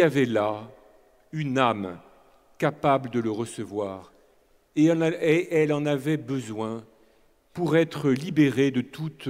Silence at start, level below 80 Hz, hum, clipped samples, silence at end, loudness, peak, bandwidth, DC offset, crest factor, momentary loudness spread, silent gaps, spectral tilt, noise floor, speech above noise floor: 0 s; -66 dBFS; none; under 0.1%; 0 s; -25 LUFS; -6 dBFS; 15.5 kHz; under 0.1%; 20 dB; 13 LU; none; -6.5 dB/octave; -61 dBFS; 37 dB